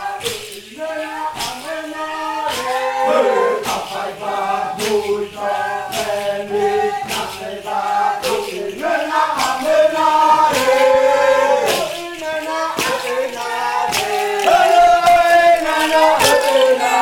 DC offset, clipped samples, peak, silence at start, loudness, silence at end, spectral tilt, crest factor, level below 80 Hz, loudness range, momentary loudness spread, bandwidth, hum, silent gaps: under 0.1%; under 0.1%; 0 dBFS; 0 s; -16 LUFS; 0 s; -2 dB/octave; 16 dB; -50 dBFS; 7 LU; 13 LU; 19 kHz; none; none